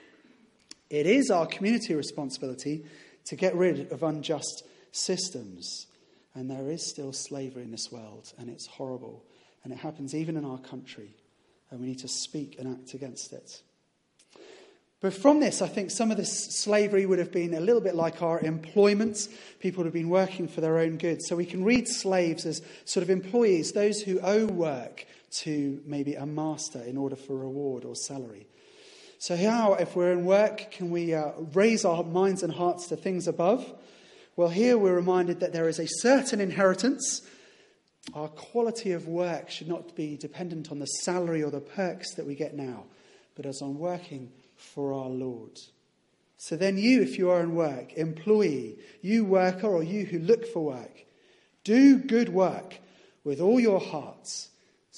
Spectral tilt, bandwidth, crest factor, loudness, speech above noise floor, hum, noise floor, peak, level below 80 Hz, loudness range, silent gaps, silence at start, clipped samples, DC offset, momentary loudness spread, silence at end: -5 dB/octave; 11.5 kHz; 22 dB; -28 LUFS; 44 dB; none; -72 dBFS; -6 dBFS; -74 dBFS; 12 LU; none; 0.9 s; under 0.1%; under 0.1%; 17 LU; 0 s